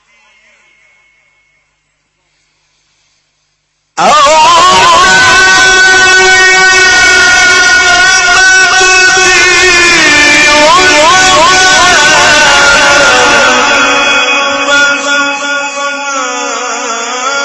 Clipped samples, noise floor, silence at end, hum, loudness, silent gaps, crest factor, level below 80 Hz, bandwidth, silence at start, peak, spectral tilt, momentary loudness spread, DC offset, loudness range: 4%; -59 dBFS; 0 s; 50 Hz at -50 dBFS; -3 LUFS; none; 6 dB; -34 dBFS; 11 kHz; 3.95 s; 0 dBFS; -0.5 dB/octave; 10 LU; under 0.1%; 6 LU